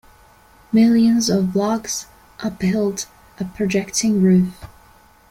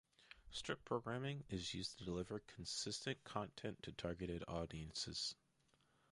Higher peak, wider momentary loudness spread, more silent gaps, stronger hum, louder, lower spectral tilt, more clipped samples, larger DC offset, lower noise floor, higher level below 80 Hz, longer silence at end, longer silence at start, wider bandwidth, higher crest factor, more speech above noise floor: first, -4 dBFS vs -26 dBFS; first, 14 LU vs 6 LU; neither; neither; first, -18 LUFS vs -47 LUFS; first, -5.5 dB/octave vs -4 dB/octave; neither; neither; second, -50 dBFS vs -79 dBFS; first, -50 dBFS vs -64 dBFS; about the same, 0.65 s vs 0.75 s; first, 0.7 s vs 0.2 s; first, 16 kHz vs 11.5 kHz; second, 14 dB vs 22 dB; about the same, 33 dB vs 31 dB